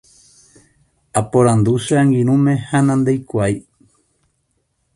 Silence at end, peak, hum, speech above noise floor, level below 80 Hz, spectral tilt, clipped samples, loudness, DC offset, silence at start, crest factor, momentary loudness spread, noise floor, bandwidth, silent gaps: 1.35 s; 0 dBFS; none; 52 dB; -48 dBFS; -7 dB/octave; under 0.1%; -16 LUFS; under 0.1%; 1.15 s; 18 dB; 7 LU; -67 dBFS; 11.5 kHz; none